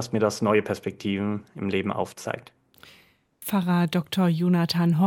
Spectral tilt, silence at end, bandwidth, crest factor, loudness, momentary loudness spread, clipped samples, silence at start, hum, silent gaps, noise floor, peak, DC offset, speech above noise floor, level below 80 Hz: -6.5 dB/octave; 0 s; 17 kHz; 18 dB; -25 LUFS; 9 LU; under 0.1%; 0 s; none; none; -59 dBFS; -8 dBFS; under 0.1%; 34 dB; -70 dBFS